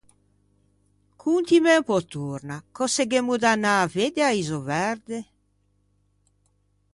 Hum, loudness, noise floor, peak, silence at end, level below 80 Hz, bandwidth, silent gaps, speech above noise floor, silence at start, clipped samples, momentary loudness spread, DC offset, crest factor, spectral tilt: 50 Hz at -55 dBFS; -23 LUFS; -67 dBFS; -6 dBFS; 1.7 s; -64 dBFS; 11.5 kHz; none; 44 dB; 1.25 s; under 0.1%; 14 LU; under 0.1%; 20 dB; -4 dB/octave